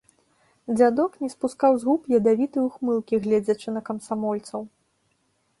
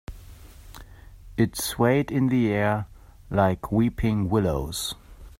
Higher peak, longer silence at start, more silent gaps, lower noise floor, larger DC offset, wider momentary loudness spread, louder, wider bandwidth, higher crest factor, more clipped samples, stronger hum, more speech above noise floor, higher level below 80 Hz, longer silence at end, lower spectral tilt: about the same, -6 dBFS vs -8 dBFS; first, 0.7 s vs 0.1 s; neither; first, -69 dBFS vs -45 dBFS; neither; about the same, 11 LU vs 11 LU; about the same, -23 LUFS vs -24 LUFS; second, 11.5 kHz vs 16 kHz; about the same, 18 dB vs 18 dB; neither; neither; first, 47 dB vs 22 dB; second, -66 dBFS vs -42 dBFS; first, 0.95 s vs 0.1 s; about the same, -6.5 dB/octave vs -6 dB/octave